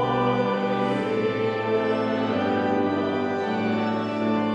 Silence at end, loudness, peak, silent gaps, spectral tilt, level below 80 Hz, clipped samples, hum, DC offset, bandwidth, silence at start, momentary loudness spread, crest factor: 0 s; -24 LUFS; -12 dBFS; none; -7.5 dB/octave; -60 dBFS; under 0.1%; none; under 0.1%; 8.8 kHz; 0 s; 2 LU; 12 dB